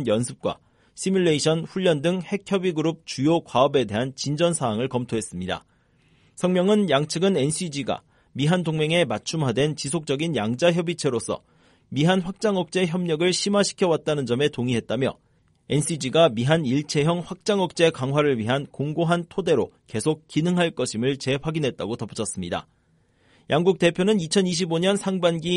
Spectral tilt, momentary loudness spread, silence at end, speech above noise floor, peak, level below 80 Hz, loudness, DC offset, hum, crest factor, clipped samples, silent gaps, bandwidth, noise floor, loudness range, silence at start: -5 dB/octave; 9 LU; 0 s; 40 dB; -4 dBFS; -58 dBFS; -23 LUFS; under 0.1%; none; 18 dB; under 0.1%; none; 11.5 kHz; -63 dBFS; 2 LU; 0 s